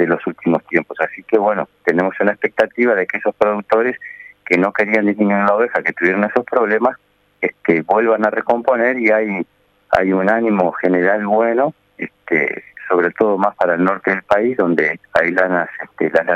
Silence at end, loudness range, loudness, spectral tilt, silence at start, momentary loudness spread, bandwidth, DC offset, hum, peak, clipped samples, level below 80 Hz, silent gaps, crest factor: 0 s; 1 LU; -16 LUFS; -8 dB/octave; 0 s; 7 LU; 8.4 kHz; under 0.1%; none; 0 dBFS; under 0.1%; -58 dBFS; none; 16 dB